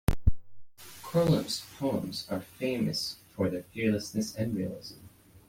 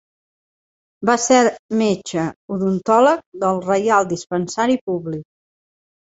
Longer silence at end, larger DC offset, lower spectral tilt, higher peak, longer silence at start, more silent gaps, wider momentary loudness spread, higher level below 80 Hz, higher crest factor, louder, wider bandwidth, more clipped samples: second, 0.1 s vs 0.8 s; neither; about the same, -5.5 dB/octave vs -4.5 dB/octave; second, -10 dBFS vs -2 dBFS; second, 0.1 s vs 1 s; second, none vs 1.59-1.69 s, 2.36-2.48 s, 3.26-3.32 s, 4.81-4.87 s; first, 17 LU vs 10 LU; first, -42 dBFS vs -60 dBFS; about the same, 20 dB vs 18 dB; second, -32 LUFS vs -18 LUFS; first, 16.5 kHz vs 8.2 kHz; neither